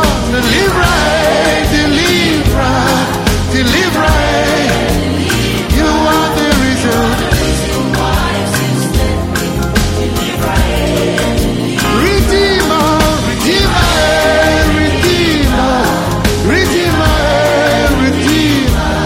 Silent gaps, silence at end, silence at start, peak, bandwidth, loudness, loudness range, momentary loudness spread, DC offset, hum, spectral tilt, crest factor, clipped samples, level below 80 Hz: none; 0 s; 0 s; 0 dBFS; 16.5 kHz; -11 LUFS; 3 LU; 4 LU; 0.2%; none; -4.5 dB/octave; 10 dB; under 0.1%; -20 dBFS